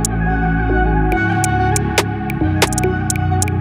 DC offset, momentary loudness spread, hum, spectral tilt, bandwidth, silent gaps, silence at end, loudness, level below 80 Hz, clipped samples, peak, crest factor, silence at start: under 0.1%; 3 LU; none; -5 dB/octave; over 20 kHz; none; 0 s; -17 LUFS; -24 dBFS; under 0.1%; 0 dBFS; 16 dB; 0 s